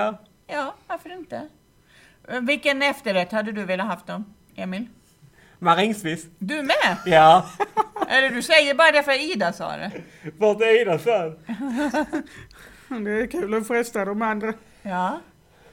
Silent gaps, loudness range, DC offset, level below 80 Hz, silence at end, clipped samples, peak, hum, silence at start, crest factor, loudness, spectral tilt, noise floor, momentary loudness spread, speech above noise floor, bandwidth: none; 8 LU; under 0.1%; -58 dBFS; 0.5 s; under 0.1%; -2 dBFS; none; 0 s; 22 dB; -21 LUFS; -4 dB/octave; -55 dBFS; 19 LU; 33 dB; 17 kHz